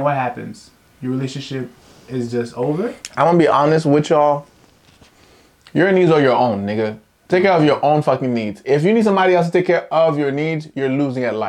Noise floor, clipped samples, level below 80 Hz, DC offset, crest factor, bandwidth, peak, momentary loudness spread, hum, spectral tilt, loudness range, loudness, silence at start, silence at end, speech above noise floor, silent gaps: -50 dBFS; under 0.1%; -60 dBFS; under 0.1%; 14 dB; 11.5 kHz; -2 dBFS; 12 LU; none; -7 dB/octave; 3 LU; -17 LUFS; 0 s; 0 s; 34 dB; none